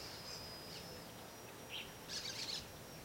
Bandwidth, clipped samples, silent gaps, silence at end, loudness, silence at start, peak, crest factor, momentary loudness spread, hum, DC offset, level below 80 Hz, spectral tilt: 16.5 kHz; under 0.1%; none; 0 s; -47 LUFS; 0 s; -32 dBFS; 18 dB; 10 LU; none; under 0.1%; -68 dBFS; -2 dB/octave